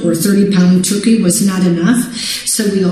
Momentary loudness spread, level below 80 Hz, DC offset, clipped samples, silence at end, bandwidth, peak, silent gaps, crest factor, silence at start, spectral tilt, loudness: 4 LU; -50 dBFS; 0.3%; under 0.1%; 0 s; 14.5 kHz; 0 dBFS; none; 12 dB; 0 s; -5 dB/octave; -12 LUFS